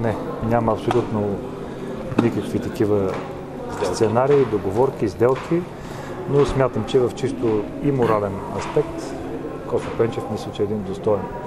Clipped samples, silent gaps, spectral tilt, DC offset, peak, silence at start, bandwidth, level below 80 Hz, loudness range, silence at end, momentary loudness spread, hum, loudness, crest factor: under 0.1%; none; -7 dB/octave; under 0.1%; 0 dBFS; 0 s; 13.5 kHz; -42 dBFS; 3 LU; 0 s; 11 LU; none; -22 LUFS; 20 dB